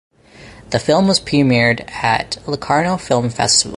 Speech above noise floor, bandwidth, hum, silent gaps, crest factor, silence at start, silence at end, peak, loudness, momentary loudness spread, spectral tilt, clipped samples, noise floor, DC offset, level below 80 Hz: 25 dB; 11.5 kHz; none; none; 16 dB; 0.4 s; 0 s; 0 dBFS; -16 LUFS; 7 LU; -4 dB/octave; under 0.1%; -41 dBFS; under 0.1%; -44 dBFS